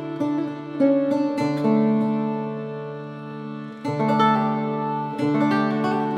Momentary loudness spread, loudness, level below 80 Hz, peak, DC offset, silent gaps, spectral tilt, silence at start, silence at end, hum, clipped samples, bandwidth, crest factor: 14 LU; -22 LUFS; -72 dBFS; -8 dBFS; under 0.1%; none; -8 dB/octave; 0 s; 0 s; none; under 0.1%; 9.4 kHz; 14 dB